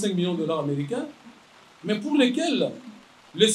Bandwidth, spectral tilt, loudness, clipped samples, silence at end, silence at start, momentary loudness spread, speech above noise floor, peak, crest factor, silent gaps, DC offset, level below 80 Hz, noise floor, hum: 14 kHz; -4.5 dB/octave; -25 LUFS; under 0.1%; 0 s; 0 s; 18 LU; 28 dB; -4 dBFS; 22 dB; none; under 0.1%; -74 dBFS; -53 dBFS; none